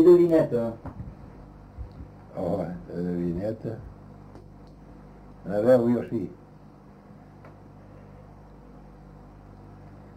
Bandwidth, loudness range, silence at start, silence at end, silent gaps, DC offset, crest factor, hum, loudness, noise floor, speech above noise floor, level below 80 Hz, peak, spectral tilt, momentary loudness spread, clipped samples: 8.6 kHz; 20 LU; 0 s; 0.15 s; none; under 0.1%; 20 dB; 50 Hz at -55 dBFS; -25 LUFS; -49 dBFS; 27 dB; -50 dBFS; -6 dBFS; -9.5 dB/octave; 28 LU; under 0.1%